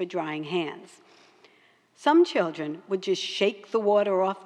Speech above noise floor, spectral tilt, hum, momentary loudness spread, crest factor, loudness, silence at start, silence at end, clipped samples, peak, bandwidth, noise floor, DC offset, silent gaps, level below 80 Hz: 36 dB; -5 dB/octave; none; 10 LU; 16 dB; -26 LUFS; 0 s; 0 s; under 0.1%; -10 dBFS; 10 kHz; -61 dBFS; under 0.1%; none; under -90 dBFS